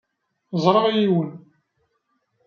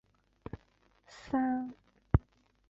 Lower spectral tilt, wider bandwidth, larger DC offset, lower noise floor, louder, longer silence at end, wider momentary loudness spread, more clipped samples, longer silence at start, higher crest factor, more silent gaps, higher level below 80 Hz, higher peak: second, -7.5 dB/octave vs -9 dB/octave; about the same, 7 kHz vs 7.6 kHz; neither; about the same, -71 dBFS vs -69 dBFS; first, -20 LUFS vs -34 LUFS; first, 1.1 s vs 0.5 s; second, 12 LU vs 21 LU; neither; about the same, 0.5 s vs 0.55 s; about the same, 22 dB vs 26 dB; neither; second, -68 dBFS vs -44 dBFS; first, -2 dBFS vs -10 dBFS